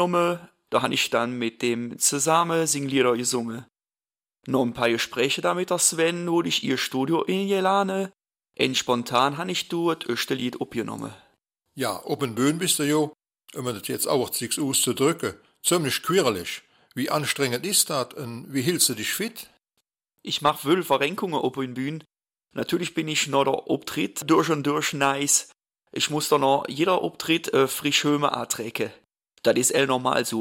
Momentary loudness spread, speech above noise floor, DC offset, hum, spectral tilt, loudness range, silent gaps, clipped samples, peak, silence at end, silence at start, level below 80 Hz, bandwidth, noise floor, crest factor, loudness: 11 LU; over 66 dB; under 0.1%; none; -3 dB/octave; 4 LU; none; under 0.1%; -4 dBFS; 0 s; 0 s; -66 dBFS; 16.5 kHz; under -90 dBFS; 20 dB; -24 LUFS